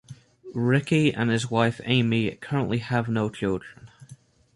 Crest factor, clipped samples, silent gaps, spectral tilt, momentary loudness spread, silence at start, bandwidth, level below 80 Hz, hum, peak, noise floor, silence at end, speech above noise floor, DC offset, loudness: 18 dB; under 0.1%; none; -6.5 dB/octave; 7 LU; 0.1 s; 11.5 kHz; -56 dBFS; none; -8 dBFS; -51 dBFS; 0.4 s; 27 dB; under 0.1%; -25 LUFS